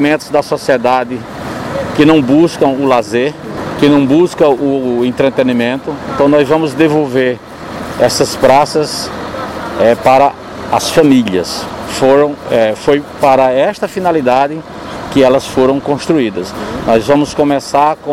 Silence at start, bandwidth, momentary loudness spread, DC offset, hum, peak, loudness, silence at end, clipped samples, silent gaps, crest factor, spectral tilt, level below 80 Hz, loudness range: 0 s; 16 kHz; 12 LU; under 0.1%; none; 0 dBFS; -11 LUFS; 0 s; under 0.1%; none; 12 dB; -5.5 dB/octave; -42 dBFS; 2 LU